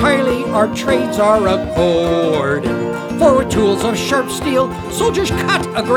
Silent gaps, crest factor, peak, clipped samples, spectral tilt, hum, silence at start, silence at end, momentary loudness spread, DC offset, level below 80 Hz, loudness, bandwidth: none; 14 dB; 0 dBFS; under 0.1%; -5 dB/octave; none; 0 s; 0 s; 5 LU; under 0.1%; -36 dBFS; -15 LUFS; 18.5 kHz